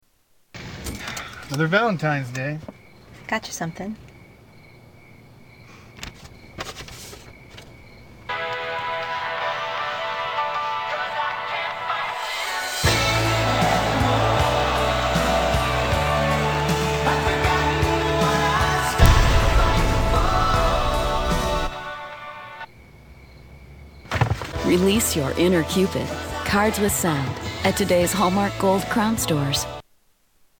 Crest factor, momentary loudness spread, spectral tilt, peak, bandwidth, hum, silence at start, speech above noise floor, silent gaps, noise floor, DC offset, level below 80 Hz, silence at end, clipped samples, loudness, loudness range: 22 dB; 17 LU; -4.5 dB/octave; 0 dBFS; 18 kHz; none; 0.55 s; 40 dB; none; -62 dBFS; under 0.1%; -30 dBFS; 0.8 s; under 0.1%; -22 LUFS; 15 LU